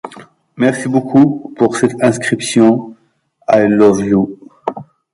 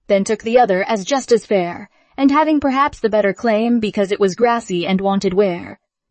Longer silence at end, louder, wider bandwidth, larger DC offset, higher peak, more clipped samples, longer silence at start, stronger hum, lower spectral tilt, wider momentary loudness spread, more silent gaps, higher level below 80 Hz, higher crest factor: about the same, 0.3 s vs 0.35 s; first, -13 LUFS vs -17 LUFS; first, 11.5 kHz vs 8.8 kHz; neither; about the same, 0 dBFS vs -2 dBFS; neither; about the same, 0.05 s vs 0.1 s; neither; about the same, -6 dB/octave vs -5.5 dB/octave; first, 14 LU vs 5 LU; neither; about the same, -52 dBFS vs -52 dBFS; about the same, 14 dB vs 14 dB